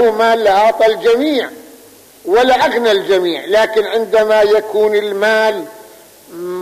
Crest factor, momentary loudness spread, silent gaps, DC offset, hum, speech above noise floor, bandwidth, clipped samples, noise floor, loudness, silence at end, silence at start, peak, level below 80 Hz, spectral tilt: 10 dB; 12 LU; none; under 0.1%; none; 29 dB; 15 kHz; under 0.1%; -41 dBFS; -13 LUFS; 0 s; 0 s; -4 dBFS; -52 dBFS; -3.5 dB/octave